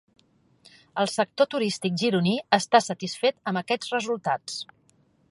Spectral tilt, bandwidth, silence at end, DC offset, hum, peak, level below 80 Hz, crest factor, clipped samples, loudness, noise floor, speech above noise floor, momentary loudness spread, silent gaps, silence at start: -4.5 dB/octave; 11.5 kHz; 0.7 s; under 0.1%; none; -4 dBFS; -72 dBFS; 22 dB; under 0.1%; -25 LUFS; -64 dBFS; 39 dB; 9 LU; none; 0.95 s